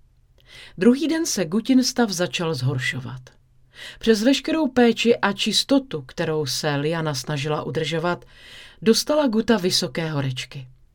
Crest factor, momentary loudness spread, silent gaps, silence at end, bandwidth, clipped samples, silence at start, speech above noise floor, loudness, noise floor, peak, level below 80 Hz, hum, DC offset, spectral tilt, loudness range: 20 dB; 14 LU; none; 0.25 s; 18 kHz; under 0.1%; 0.5 s; 33 dB; -21 LUFS; -55 dBFS; -2 dBFS; -52 dBFS; none; under 0.1%; -4.5 dB/octave; 3 LU